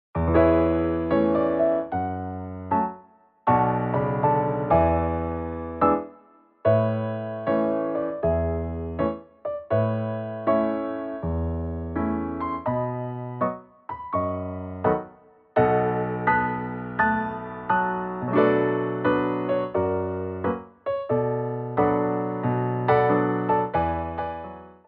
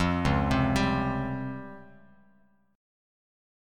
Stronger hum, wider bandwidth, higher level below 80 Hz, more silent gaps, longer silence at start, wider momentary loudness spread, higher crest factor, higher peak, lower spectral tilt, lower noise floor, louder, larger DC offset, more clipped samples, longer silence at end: neither; second, 4.9 kHz vs 14 kHz; about the same, -42 dBFS vs -42 dBFS; neither; first, 0.15 s vs 0 s; second, 10 LU vs 17 LU; about the same, 18 dB vs 18 dB; first, -6 dBFS vs -12 dBFS; about the same, -7 dB/octave vs -6.5 dB/octave; second, -55 dBFS vs -65 dBFS; about the same, -25 LUFS vs -27 LUFS; neither; neither; second, 0.15 s vs 1.9 s